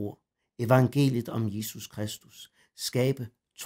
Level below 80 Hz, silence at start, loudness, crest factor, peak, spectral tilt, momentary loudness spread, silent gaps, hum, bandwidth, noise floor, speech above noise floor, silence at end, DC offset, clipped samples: -68 dBFS; 0 s; -28 LUFS; 20 dB; -8 dBFS; -6 dB/octave; 19 LU; none; none; 16 kHz; -47 dBFS; 19 dB; 0 s; under 0.1%; under 0.1%